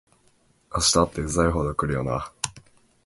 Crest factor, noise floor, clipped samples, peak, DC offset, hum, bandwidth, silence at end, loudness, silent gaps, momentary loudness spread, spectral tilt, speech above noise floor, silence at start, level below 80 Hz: 24 dB; -62 dBFS; under 0.1%; -2 dBFS; under 0.1%; none; 12 kHz; 0.45 s; -24 LUFS; none; 13 LU; -4 dB/octave; 39 dB; 0.7 s; -38 dBFS